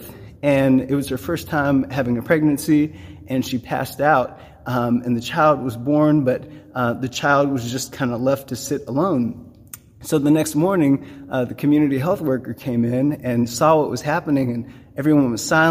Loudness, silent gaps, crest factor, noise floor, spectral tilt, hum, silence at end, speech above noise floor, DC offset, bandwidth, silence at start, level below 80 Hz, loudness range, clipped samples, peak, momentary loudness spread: -20 LUFS; none; 18 dB; -42 dBFS; -6 dB/octave; none; 0 s; 23 dB; under 0.1%; 15.5 kHz; 0 s; -50 dBFS; 2 LU; under 0.1%; -2 dBFS; 9 LU